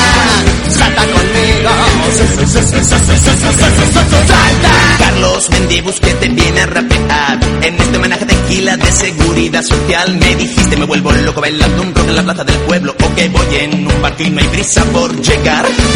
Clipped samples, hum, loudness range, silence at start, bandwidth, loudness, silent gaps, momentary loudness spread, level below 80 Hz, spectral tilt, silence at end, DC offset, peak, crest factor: 0.6%; none; 3 LU; 0 s; 13 kHz; -9 LUFS; none; 5 LU; -16 dBFS; -4 dB/octave; 0 s; under 0.1%; 0 dBFS; 10 dB